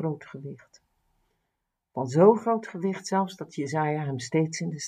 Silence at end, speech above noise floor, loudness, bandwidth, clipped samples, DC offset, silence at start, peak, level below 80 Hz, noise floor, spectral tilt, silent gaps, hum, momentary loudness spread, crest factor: 0 s; 55 dB; -26 LUFS; 10.5 kHz; under 0.1%; under 0.1%; 0 s; -6 dBFS; -76 dBFS; -81 dBFS; -6 dB/octave; none; none; 19 LU; 22 dB